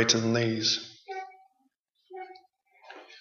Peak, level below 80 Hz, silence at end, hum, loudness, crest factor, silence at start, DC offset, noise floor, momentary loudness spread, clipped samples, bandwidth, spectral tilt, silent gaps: -8 dBFS; -74 dBFS; 0 s; none; -28 LUFS; 24 dB; 0 s; under 0.1%; -74 dBFS; 24 LU; under 0.1%; 7.6 kHz; -3 dB/octave; 1.79-1.85 s